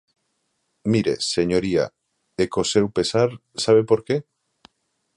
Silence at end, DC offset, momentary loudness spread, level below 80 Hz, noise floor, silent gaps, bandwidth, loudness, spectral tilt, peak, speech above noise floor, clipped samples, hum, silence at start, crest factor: 0.95 s; under 0.1%; 8 LU; -52 dBFS; -72 dBFS; none; 11 kHz; -21 LUFS; -5 dB/octave; -4 dBFS; 52 dB; under 0.1%; none; 0.85 s; 18 dB